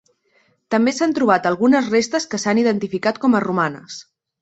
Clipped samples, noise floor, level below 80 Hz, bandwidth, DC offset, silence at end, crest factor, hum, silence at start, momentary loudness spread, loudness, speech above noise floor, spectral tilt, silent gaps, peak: under 0.1%; -61 dBFS; -62 dBFS; 8.2 kHz; under 0.1%; 0.4 s; 18 dB; none; 0.7 s; 7 LU; -18 LUFS; 43 dB; -5 dB/octave; none; -2 dBFS